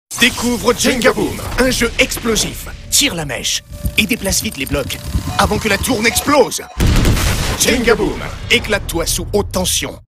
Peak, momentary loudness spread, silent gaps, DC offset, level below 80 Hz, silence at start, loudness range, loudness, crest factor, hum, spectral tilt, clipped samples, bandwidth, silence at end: 0 dBFS; 7 LU; none; under 0.1%; -26 dBFS; 0.1 s; 2 LU; -15 LUFS; 16 dB; none; -3 dB/octave; under 0.1%; 16.5 kHz; 0.05 s